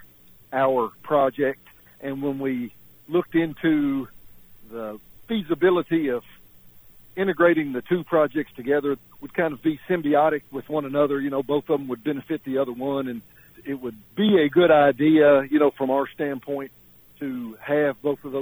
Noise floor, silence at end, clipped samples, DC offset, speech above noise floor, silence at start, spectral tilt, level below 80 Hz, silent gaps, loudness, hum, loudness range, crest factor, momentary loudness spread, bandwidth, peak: -51 dBFS; 0 s; under 0.1%; under 0.1%; 28 dB; 0.5 s; -8 dB/octave; -60 dBFS; none; -23 LUFS; none; 7 LU; 16 dB; 16 LU; over 20 kHz; -6 dBFS